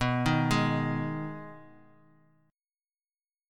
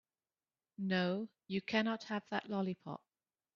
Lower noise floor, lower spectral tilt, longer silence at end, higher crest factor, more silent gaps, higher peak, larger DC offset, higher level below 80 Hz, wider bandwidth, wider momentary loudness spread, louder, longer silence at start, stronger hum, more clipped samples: about the same, under -90 dBFS vs under -90 dBFS; first, -6 dB/octave vs -4.5 dB/octave; first, 1.85 s vs 0.6 s; about the same, 20 dB vs 22 dB; neither; first, -12 dBFS vs -18 dBFS; neither; first, -52 dBFS vs -80 dBFS; first, 15.5 kHz vs 7 kHz; first, 16 LU vs 13 LU; first, -29 LUFS vs -38 LUFS; second, 0 s vs 0.8 s; neither; neither